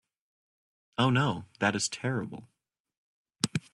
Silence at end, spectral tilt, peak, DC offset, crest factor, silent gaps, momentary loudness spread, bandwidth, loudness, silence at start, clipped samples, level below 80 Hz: 0.15 s; -4.5 dB/octave; -6 dBFS; under 0.1%; 26 dB; 2.80-2.85 s, 2.97-3.25 s; 13 LU; 12 kHz; -30 LUFS; 1 s; under 0.1%; -68 dBFS